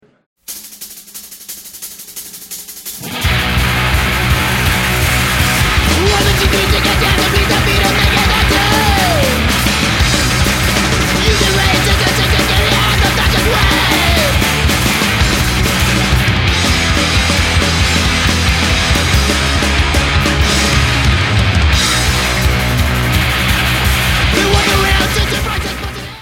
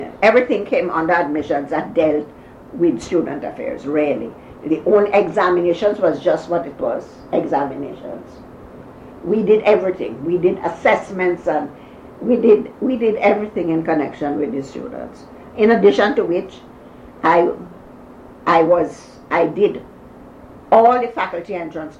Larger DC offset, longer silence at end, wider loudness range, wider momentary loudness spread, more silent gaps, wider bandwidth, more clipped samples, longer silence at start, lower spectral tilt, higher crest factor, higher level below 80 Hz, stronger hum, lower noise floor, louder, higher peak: neither; about the same, 0 s vs 0.05 s; about the same, 3 LU vs 3 LU; second, 13 LU vs 17 LU; neither; first, 16.5 kHz vs 8.6 kHz; neither; first, 0.5 s vs 0 s; second, -3.5 dB/octave vs -7 dB/octave; about the same, 12 dB vs 16 dB; first, -20 dBFS vs -52 dBFS; neither; second, -33 dBFS vs -40 dBFS; first, -12 LUFS vs -17 LUFS; about the same, 0 dBFS vs -2 dBFS